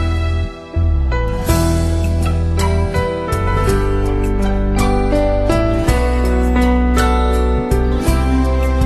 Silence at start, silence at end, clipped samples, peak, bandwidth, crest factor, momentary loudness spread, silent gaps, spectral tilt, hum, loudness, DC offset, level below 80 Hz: 0 s; 0 s; under 0.1%; -2 dBFS; 13 kHz; 14 dB; 4 LU; none; -6.5 dB/octave; none; -16 LUFS; under 0.1%; -16 dBFS